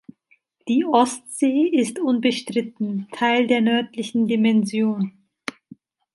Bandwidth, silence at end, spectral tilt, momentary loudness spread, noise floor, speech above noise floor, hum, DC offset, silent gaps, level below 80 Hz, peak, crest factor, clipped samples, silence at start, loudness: 11.5 kHz; 1.05 s; -5 dB/octave; 11 LU; -63 dBFS; 43 dB; none; under 0.1%; none; -72 dBFS; -4 dBFS; 18 dB; under 0.1%; 0.65 s; -21 LUFS